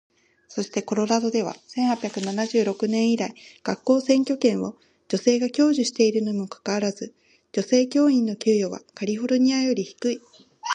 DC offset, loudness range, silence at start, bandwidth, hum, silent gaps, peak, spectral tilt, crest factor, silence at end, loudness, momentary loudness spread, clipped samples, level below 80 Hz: under 0.1%; 2 LU; 0.5 s; 9.6 kHz; none; none; -6 dBFS; -4.5 dB/octave; 18 dB; 0 s; -23 LUFS; 11 LU; under 0.1%; -72 dBFS